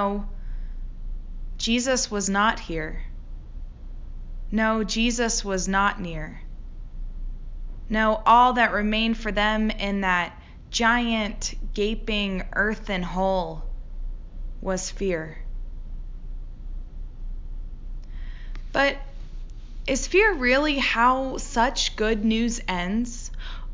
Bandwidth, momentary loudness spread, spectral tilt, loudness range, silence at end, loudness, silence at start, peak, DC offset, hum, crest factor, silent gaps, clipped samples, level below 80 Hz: 7.6 kHz; 21 LU; -3.5 dB/octave; 11 LU; 0 s; -23 LUFS; 0 s; -6 dBFS; under 0.1%; none; 20 dB; none; under 0.1%; -34 dBFS